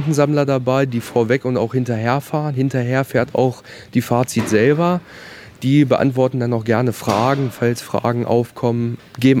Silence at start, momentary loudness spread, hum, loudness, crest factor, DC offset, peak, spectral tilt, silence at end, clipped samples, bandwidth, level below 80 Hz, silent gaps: 0 s; 7 LU; none; -18 LUFS; 18 dB; under 0.1%; 0 dBFS; -7 dB/octave; 0 s; under 0.1%; 16.5 kHz; -56 dBFS; none